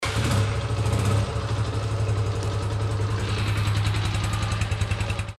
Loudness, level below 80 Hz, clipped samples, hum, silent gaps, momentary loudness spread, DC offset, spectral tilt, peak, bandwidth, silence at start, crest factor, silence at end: -25 LUFS; -34 dBFS; under 0.1%; none; none; 3 LU; under 0.1%; -5.5 dB/octave; -12 dBFS; 12.5 kHz; 0 s; 12 dB; 0.05 s